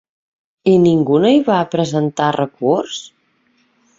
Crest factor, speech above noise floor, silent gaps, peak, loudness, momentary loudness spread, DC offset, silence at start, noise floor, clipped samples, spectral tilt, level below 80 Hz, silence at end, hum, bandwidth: 14 dB; 46 dB; none; -2 dBFS; -15 LUFS; 8 LU; under 0.1%; 0.65 s; -60 dBFS; under 0.1%; -6.5 dB/octave; -58 dBFS; 0.95 s; none; 7.8 kHz